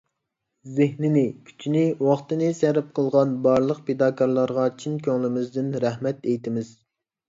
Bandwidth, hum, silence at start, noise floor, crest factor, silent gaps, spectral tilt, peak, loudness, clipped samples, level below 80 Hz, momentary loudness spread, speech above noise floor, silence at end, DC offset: 7.8 kHz; none; 0.65 s; -80 dBFS; 18 dB; none; -8 dB/octave; -6 dBFS; -23 LUFS; under 0.1%; -66 dBFS; 7 LU; 58 dB; 0.6 s; under 0.1%